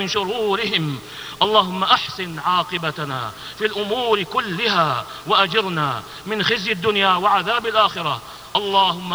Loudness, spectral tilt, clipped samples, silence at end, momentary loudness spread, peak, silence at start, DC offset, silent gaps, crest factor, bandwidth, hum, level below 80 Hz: -19 LUFS; -4 dB/octave; under 0.1%; 0 s; 10 LU; 0 dBFS; 0 s; under 0.1%; none; 20 dB; 19.5 kHz; none; -56 dBFS